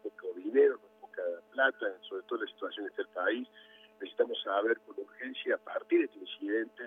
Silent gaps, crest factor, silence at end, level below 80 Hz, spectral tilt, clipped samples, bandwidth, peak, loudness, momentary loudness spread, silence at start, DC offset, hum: none; 20 dB; 0 s; under -90 dBFS; -5 dB/octave; under 0.1%; 3.9 kHz; -14 dBFS; -33 LUFS; 14 LU; 0.05 s; under 0.1%; none